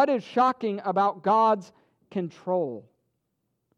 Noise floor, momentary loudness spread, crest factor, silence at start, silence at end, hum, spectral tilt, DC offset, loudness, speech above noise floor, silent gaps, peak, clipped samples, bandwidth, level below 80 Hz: -78 dBFS; 12 LU; 18 dB; 0 s; 0.95 s; none; -7 dB/octave; under 0.1%; -25 LUFS; 53 dB; none; -10 dBFS; under 0.1%; 9.6 kHz; -80 dBFS